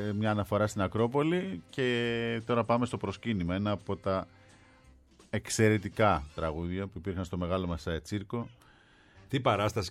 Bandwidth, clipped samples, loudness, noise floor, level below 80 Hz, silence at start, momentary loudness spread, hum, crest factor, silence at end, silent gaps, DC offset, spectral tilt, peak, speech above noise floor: 14.5 kHz; under 0.1%; -31 LUFS; -60 dBFS; -52 dBFS; 0 s; 9 LU; none; 20 dB; 0 s; none; under 0.1%; -6 dB/octave; -12 dBFS; 29 dB